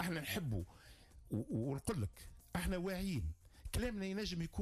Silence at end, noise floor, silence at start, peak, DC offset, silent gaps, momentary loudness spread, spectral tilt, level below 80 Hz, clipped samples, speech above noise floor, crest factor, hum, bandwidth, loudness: 0 s; -60 dBFS; 0 s; -28 dBFS; under 0.1%; none; 14 LU; -5.5 dB/octave; -52 dBFS; under 0.1%; 20 dB; 14 dB; none; 15.5 kHz; -42 LUFS